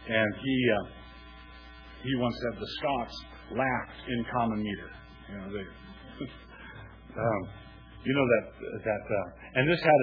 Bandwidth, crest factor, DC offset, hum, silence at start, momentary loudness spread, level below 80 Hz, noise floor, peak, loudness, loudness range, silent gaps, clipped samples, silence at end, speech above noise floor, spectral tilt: 5.4 kHz; 22 dB; under 0.1%; none; 0 s; 22 LU; -52 dBFS; -49 dBFS; -10 dBFS; -30 LUFS; 6 LU; none; under 0.1%; 0 s; 19 dB; -7.5 dB/octave